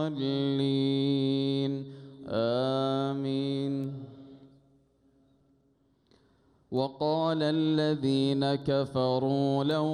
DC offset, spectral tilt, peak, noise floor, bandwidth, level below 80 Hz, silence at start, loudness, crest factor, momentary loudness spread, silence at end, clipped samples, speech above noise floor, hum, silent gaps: under 0.1%; -7.5 dB/octave; -16 dBFS; -69 dBFS; 10 kHz; -68 dBFS; 0 s; -29 LUFS; 14 dB; 8 LU; 0 s; under 0.1%; 41 dB; none; none